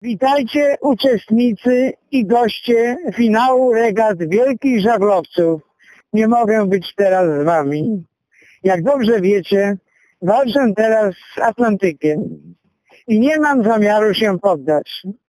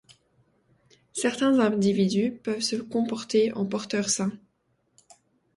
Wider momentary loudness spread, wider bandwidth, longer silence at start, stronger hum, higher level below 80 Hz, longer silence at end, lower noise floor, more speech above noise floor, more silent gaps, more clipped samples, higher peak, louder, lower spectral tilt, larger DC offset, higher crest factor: about the same, 6 LU vs 7 LU; first, 14.5 kHz vs 11.5 kHz; second, 0.05 s vs 1.15 s; neither; first, -58 dBFS vs -68 dBFS; second, 0.25 s vs 1.2 s; second, -52 dBFS vs -71 dBFS; second, 37 dB vs 46 dB; neither; neither; first, 0 dBFS vs -10 dBFS; first, -15 LUFS vs -26 LUFS; first, -6.5 dB/octave vs -4.5 dB/octave; neither; about the same, 14 dB vs 16 dB